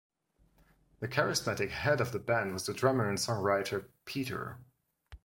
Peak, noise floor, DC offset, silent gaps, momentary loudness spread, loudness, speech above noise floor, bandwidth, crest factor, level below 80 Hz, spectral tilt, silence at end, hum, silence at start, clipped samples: -12 dBFS; -70 dBFS; under 0.1%; none; 10 LU; -32 LUFS; 37 dB; 16.5 kHz; 22 dB; -62 dBFS; -4.5 dB/octave; 0.1 s; none; 1 s; under 0.1%